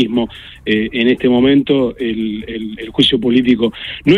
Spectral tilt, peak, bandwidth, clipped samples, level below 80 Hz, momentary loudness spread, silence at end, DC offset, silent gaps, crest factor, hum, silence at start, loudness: -6.5 dB/octave; 0 dBFS; 10.5 kHz; under 0.1%; -42 dBFS; 12 LU; 0 s; under 0.1%; none; 14 dB; none; 0 s; -15 LUFS